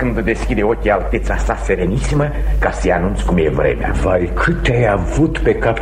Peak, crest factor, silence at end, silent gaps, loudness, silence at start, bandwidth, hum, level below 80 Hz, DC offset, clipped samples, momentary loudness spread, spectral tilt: -2 dBFS; 14 dB; 0 s; none; -16 LUFS; 0 s; 10 kHz; none; -20 dBFS; under 0.1%; under 0.1%; 3 LU; -7 dB/octave